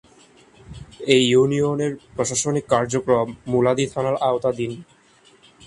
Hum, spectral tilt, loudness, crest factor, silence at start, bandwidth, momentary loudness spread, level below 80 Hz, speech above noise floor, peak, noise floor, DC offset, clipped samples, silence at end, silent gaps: none; -4.5 dB/octave; -21 LUFS; 22 dB; 0.7 s; 11.5 kHz; 12 LU; -54 dBFS; 34 dB; 0 dBFS; -54 dBFS; under 0.1%; under 0.1%; 0.85 s; none